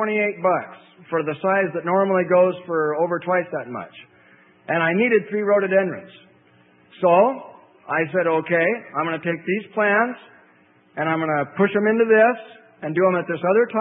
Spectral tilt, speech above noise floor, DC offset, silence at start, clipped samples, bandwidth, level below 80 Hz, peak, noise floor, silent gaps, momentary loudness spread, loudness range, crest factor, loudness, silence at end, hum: -11 dB/octave; 36 dB; under 0.1%; 0 s; under 0.1%; 3.9 kHz; -74 dBFS; -4 dBFS; -56 dBFS; none; 12 LU; 2 LU; 18 dB; -20 LUFS; 0 s; none